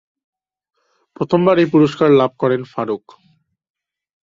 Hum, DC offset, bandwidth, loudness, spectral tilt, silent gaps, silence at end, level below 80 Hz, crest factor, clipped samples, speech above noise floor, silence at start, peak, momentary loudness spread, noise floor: none; under 0.1%; 7.6 kHz; -15 LUFS; -8 dB/octave; none; 1.25 s; -58 dBFS; 16 dB; under 0.1%; 45 dB; 1.2 s; -2 dBFS; 12 LU; -59 dBFS